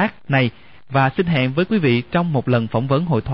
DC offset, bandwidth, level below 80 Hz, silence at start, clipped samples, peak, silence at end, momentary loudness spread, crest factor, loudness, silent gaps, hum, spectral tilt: 0.6%; 5.6 kHz; -46 dBFS; 0 s; under 0.1%; -6 dBFS; 0 s; 2 LU; 12 dB; -19 LUFS; none; none; -10.5 dB/octave